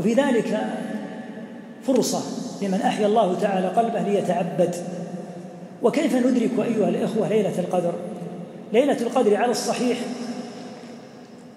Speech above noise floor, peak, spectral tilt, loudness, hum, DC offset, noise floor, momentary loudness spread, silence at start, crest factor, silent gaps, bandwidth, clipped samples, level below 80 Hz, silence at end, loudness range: 21 dB; -6 dBFS; -5.5 dB/octave; -23 LUFS; none; under 0.1%; -43 dBFS; 17 LU; 0 s; 16 dB; none; 16 kHz; under 0.1%; -76 dBFS; 0 s; 2 LU